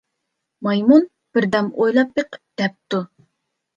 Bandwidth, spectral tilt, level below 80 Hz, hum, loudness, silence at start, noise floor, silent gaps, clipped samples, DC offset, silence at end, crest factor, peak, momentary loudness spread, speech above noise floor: 7.4 kHz; -7 dB/octave; -62 dBFS; none; -19 LUFS; 0.6 s; -77 dBFS; none; under 0.1%; under 0.1%; 0.7 s; 18 dB; -2 dBFS; 12 LU; 60 dB